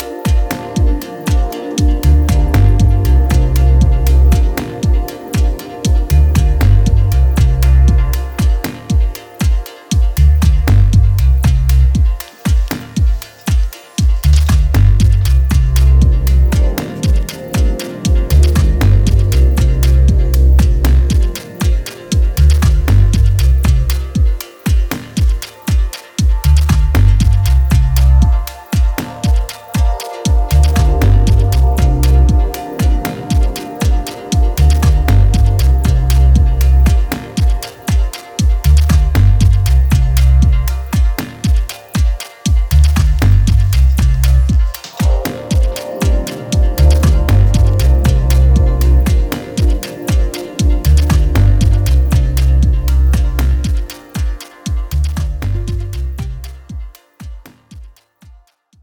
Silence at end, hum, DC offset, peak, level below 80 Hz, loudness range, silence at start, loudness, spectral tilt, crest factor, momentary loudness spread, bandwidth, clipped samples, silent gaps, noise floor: 0.95 s; none; under 0.1%; 0 dBFS; -12 dBFS; 3 LU; 0 s; -13 LUFS; -6.5 dB/octave; 10 dB; 8 LU; over 20 kHz; under 0.1%; none; -46 dBFS